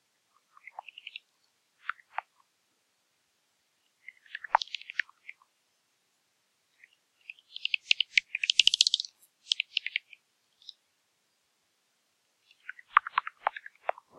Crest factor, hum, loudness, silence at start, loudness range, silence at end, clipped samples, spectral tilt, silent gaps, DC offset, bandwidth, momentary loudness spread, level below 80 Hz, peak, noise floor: 32 dB; none; -28 LUFS; 1.9 s; 19 LU; 0.7 s; under 0.1%; 4 dB/octave; none; under 0.1%; 14 kHz; 25 LU; -78 dBFS; -4 dBFS; -75 dBFS